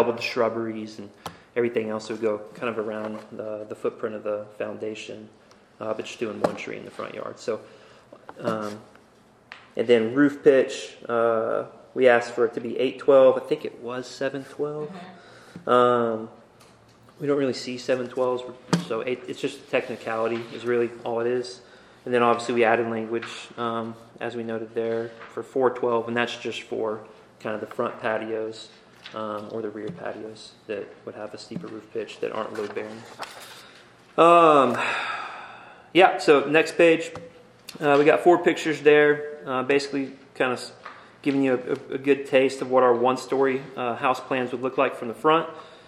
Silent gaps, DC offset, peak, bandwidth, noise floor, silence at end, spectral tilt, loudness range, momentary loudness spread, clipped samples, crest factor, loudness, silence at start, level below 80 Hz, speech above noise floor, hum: none; under 0.1%; -2 dBFS; 13 kHz; -56 dBFS; 0.1 s; -5.5 dB/octave; 12 LU; 18 LU; under 0.1%; 22 dB; -24 LUFS; 0 s; -72 dBFS; 32 dB; none